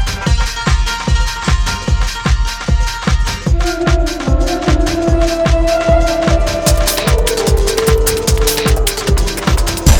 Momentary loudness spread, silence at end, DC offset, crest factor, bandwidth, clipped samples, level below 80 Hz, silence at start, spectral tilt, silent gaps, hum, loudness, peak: 4 LU; 0 s; under 0.1%; 12 dB; over 20 kHz; under 0.1%; -16 dBFS; 0 s; -4.5 dB/octave; none; none; -14 LUFS; 0 dBFS